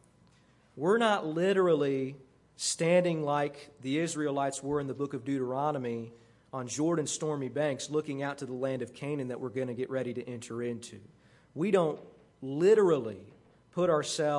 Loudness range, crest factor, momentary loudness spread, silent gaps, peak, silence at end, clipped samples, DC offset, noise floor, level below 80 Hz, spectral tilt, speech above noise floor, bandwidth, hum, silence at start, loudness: 6 LU; 18 dB; 14 LU; none; -12 dBFS; 0 s; under 0.1%; under 0.1%; -63 dBFS; -72 dBFS; -5 dB/octave; 33 dB; 11.5 kHz; none; 0.75 s; -31 LUFS